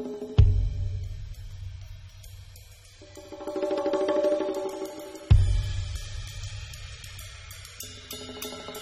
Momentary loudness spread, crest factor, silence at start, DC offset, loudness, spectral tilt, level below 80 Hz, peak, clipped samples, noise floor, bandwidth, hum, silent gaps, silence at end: 23 LU; 22 dB; 0 s; under 0.1%; -29 LUFS; -6.5 dB/octave; -32 dBFS; -6 dBFS; under 0.1%; -49 dBFS; 15.5 kHz; none; none; 0 s